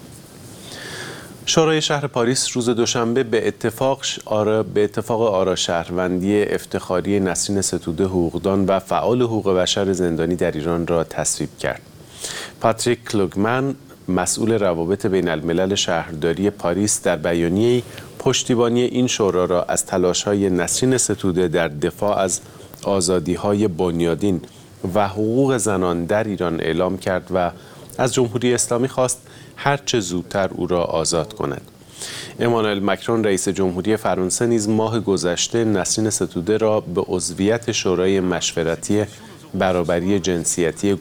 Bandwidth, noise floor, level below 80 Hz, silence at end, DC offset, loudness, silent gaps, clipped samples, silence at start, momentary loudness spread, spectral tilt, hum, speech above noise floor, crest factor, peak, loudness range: 18 kHz; -40 dBFS; -48 dBFS; 0 s; under 0.1%; -20 LUFS; none; under 0.1%; 0 s; 7 LU; -4.5 dB/octave; none; 20 dB; 18 dB; 0 dBFS; 3 LU